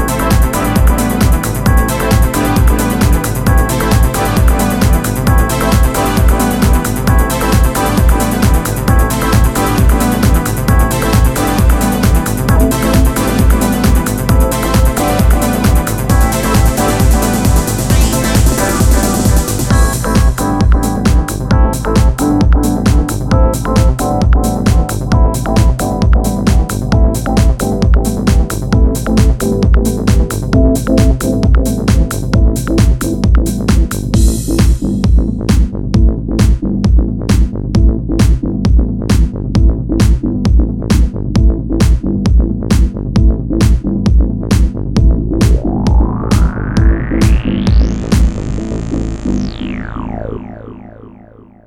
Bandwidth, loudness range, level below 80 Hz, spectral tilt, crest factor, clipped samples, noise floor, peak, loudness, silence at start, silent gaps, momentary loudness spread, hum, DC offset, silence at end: 16.5 kHz; 1 LU; -14 dBFS; -6 dB/octave; 10 dB; under 0.1%; -38 dBFS; 0 dBFS; -12 LUFS; 0 s; none; 3 LU; none; under 0.1%; 0.6 s